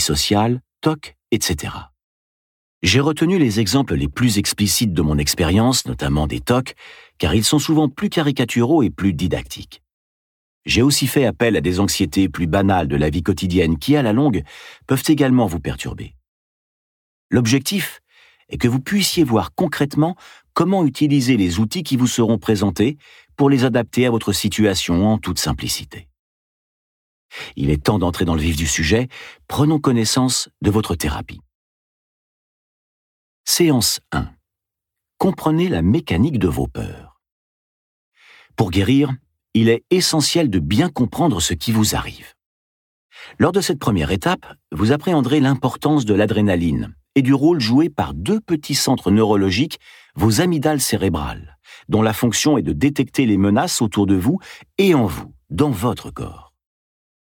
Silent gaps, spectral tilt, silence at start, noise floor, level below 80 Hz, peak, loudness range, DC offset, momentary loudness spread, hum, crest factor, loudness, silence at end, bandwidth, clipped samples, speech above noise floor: 2.04-2.81 s, 9.93-10.61 s, 16.28-17.30 s, 26.19-27.29 s, 31.55-33.44 s, 37.32-38.12 s, 42.46-43.10 s; -5 dB/octave; 0 s; -84 dBFS; -38 dBFS; -2 dBFS; 4 LU; under 0.1%; 11 LU; none; 18 dB; -18 LUFS; 0.9 s; 18.5 kHz; under 0.1%; 66 dB